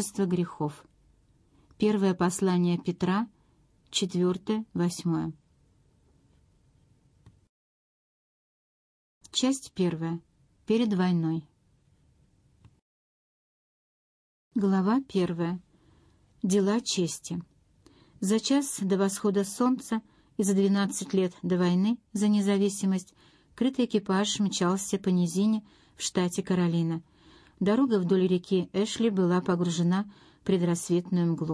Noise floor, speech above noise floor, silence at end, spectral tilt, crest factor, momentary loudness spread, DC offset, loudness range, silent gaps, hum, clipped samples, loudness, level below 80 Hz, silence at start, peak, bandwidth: -65 dBFS; 39 dB; 0 s; -5.5 dB/octave; 16 dB; 9 LU; under 0.1%; 7 LU; 7.49-9.21 s, 12.82-14.51 s; none; under 0.1%; -28 LUFS; -66 dBFS; 0 s; -14 dBFS; 11 kHz